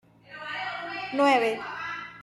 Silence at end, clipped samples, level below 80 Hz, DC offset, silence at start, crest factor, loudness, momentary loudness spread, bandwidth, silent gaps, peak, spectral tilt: 0 s; under 0.1%; -72 dBFS; under 0.1%; 0.3 s; 20 dB; -27 LUFS; 15 LU; 12.5 kHz; none; -10 dBFS; -4 dB/octave